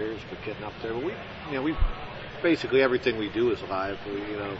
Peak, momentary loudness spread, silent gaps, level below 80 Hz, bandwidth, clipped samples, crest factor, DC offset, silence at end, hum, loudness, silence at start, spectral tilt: -10 dBFS; 13 LU; none; -38 dBFS; 8 kHz; under 0.1%; 18 dB; under 0.1%; 0 s; none; -29 LUFS; 0 s; -6.5 dB/octave